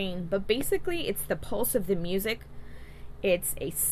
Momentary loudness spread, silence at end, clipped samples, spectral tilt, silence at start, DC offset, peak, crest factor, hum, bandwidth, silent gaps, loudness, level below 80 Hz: 21 LU; 0 s; under 0.1%; -3.5 dB/octave; 0 s; under 0.1%; -10 dBFS; 20 dB; 60 Hz at -50 dBFS; 14 kHz; none; -30 LUFS; -44 dBFS